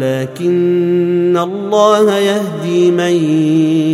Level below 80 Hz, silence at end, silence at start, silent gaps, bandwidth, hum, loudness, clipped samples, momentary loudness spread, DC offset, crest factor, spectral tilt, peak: -64 dBFS; 0 s; 0 s; none; 13.5 kHz; none; -13 LUFS; under 0.1%; 6 LU; under 0.1%; 12 dB; -6.5 dB/octave; 0 dBFS